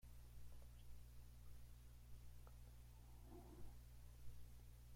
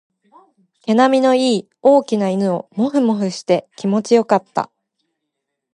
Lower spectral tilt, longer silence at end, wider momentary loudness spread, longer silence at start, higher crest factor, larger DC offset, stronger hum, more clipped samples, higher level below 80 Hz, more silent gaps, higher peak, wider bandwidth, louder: about the same, -5.5 dB/octave vs -6 dB/octave; second, 0 s vs 1.1 s; second, 2 LU vs 7 LU; second, 0 s vs 0.85 s; about the same, 14 dB vs 16 dB; neither; first, 60 Hz at -65 dBFS vs none; neither; first, -62 dBFS vs -70 dBFS; neither; second, -44 dBFS vs -2 dBFS; first, 16.5 kHz vs 11 kHz; second, -64 LUFS vs -17 LUFS